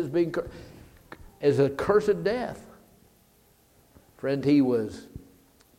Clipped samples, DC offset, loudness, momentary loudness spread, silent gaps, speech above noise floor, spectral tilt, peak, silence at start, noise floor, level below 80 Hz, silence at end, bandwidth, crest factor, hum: under 0.1%; under 0.1%; -26 LUFS; 22 LU; none; 36 dB; -7.5 dB/octave; -8 dBFS; 0 s; -61 dBFS; -56 dBFS; 0.6 s; 15.5 kHz; 20 dB; none